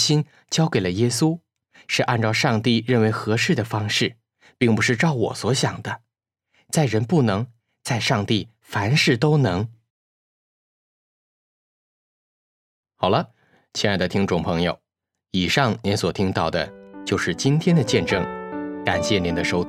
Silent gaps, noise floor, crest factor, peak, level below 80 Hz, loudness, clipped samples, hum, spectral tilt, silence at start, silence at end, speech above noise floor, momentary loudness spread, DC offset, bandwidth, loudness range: 9.90-12.83 s; -82 dBFS; 20 dB; -2 dBFS; -52 dBFS; -21 LUFS; under 0.1%; none; -5 dB/octave; 0 s; 0 s; 62 dB; 10 LU; under 0.1%; 15 kHz; 6 LU